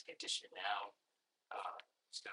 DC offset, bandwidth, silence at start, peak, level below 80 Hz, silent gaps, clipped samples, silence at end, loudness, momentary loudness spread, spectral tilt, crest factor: under 0.1%; 11 kHz; 0 s; -26 dBFS; under -90 dBFS; none; under 0.1%; 0 s; -45 LUFS; 11 LU; 1.5 dB/octave; 22 dB